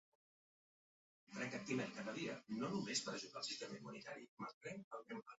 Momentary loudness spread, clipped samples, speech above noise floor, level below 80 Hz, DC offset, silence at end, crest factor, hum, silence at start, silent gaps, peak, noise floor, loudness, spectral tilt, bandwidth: 11 LU; under 0.1%; over 42 dB; -86 dBFS; under 0.1%; 0.05 s; 20 dB; none; 1.3 s; 4.29-4.37 s, 4.54-4.61 s, 4.84-4.91 s; -28 dBFS; under -90 dBFS; -47 LUFS; -3.5 dB/octave; 7.6 kHz